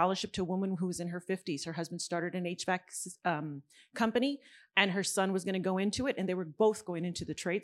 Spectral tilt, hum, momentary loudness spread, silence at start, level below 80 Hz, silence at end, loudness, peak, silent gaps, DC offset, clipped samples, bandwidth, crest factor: -4.5 dB/octave; none; 8 LU; 0 s; -68 dBFS; 0 s; -34 LUFS; -10 dBFS; none; under 0.1%; under 0.1%; 13.5 kHz; 22 dB